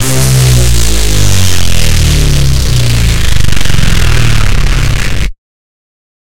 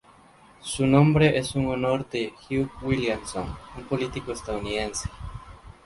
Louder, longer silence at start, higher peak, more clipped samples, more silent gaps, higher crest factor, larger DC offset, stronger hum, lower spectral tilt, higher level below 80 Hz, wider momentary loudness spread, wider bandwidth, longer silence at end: first, -10 LUFS vs -25 LUFS; second, 0 s vs 0.65 s; first, 0 dBFS vs -4 dBFS; first, 0.1% vs under 0.1%; neither; second, 8 dB vs 22 dB; neither; neither; second, -4 dB/octave vs -6 dB/octave; first, -12 dBFS vs -44 dBFS; second, 4 LU vs 17 LU; first, 17.5 kHz vs 11.5 kHz; first, 0.85 s vs 0.15 s